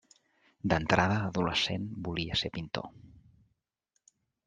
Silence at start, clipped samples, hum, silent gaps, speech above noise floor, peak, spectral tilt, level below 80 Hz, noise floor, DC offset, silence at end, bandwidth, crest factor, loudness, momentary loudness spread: 0.65 s; under 0.1%; none; none; 50 dB; -8 dBFS; -5 dB/octave; -56 dBFS; -81 dBFS; under 0.1%; 1.4 s; 9.4 kHz; 26 dB; -31 LUFS; 12 LU